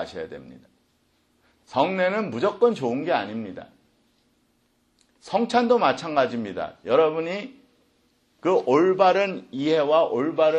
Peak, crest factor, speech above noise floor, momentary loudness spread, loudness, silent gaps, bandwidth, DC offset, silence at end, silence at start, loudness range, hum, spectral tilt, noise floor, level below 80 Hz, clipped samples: -6 dBFS; 18 dB; 44 dB; 14 LU; -23 LUFS; none; 9 kHz; under 0.1%; 0 s; 0 s; 4 LU; none; -6 dB/octave; -67 dBFS; -68 dBFS; under 0.1%